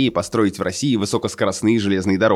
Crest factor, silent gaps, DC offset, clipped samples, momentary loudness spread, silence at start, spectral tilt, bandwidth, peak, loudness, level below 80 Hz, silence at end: 14 dB; none; under 0.1%; under 0.1%; 4 LU; 0 s; -5 dB/octave; 14 kHz; -4 dBFS; -19 LUFS; -54 dBFS; 0 s